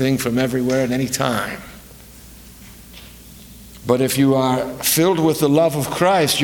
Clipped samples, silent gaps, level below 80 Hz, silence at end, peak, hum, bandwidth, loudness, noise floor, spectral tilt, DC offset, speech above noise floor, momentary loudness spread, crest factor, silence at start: under 0.1%; none; -48 dBFS; 0 s; 0 dBFS; none; 19.5 kHz; -18 LUFS; -41 dBFS; -4.5 dB/octave; under 0.1%; 24 dB; 20 LU; 18 dB; 0 s